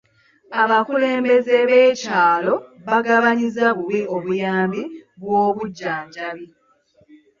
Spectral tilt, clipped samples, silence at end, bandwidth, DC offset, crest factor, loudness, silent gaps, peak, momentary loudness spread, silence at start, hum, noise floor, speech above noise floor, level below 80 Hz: -5.5 dB/octave; under 0.1%; 0.95 s; 7.4 kHz; under 0.1%; 16 dB; -18 LUFS; none; -4 dBFS; 14 LU; 0.5 s; none; -58 dBFS; 40 dB; -66 dBFS